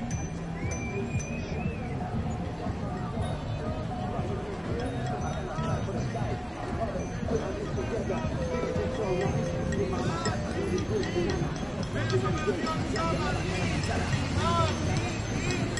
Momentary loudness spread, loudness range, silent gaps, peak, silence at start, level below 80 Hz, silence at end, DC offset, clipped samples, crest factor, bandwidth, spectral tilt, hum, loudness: 5 LU; 4 LU; none; -12 dBFS; 0 s; -42 dBFS; 0 s; under 0.1%; under 0.1%; 18 dB; 11.5 kHz; -6 dB/octave; none; -31 LUFS